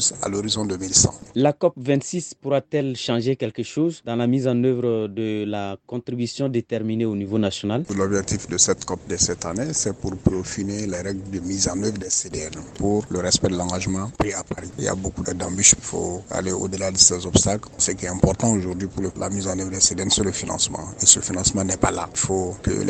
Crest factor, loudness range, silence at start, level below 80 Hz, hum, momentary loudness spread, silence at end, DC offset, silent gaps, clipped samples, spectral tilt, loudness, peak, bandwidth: 22 dB; 5 LU; 0 s; -44 dBFS; none; 11 LU; 0 s; under 0.1%; none; under 0.1%; -3.5 dB/octave; -21 LUFS; 0 dBFS; 16 kHz